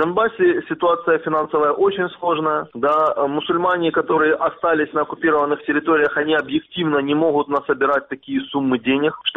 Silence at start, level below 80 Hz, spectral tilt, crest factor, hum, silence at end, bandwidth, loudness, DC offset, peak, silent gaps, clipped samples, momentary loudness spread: 0 s; -58 dBFS; -7.5 dB/octave; 14 dB; none; 0.05 s; 4 kHz; -19 LUFS; under 0.1%; -4 dBFS; none; under 0.1%; 5 LU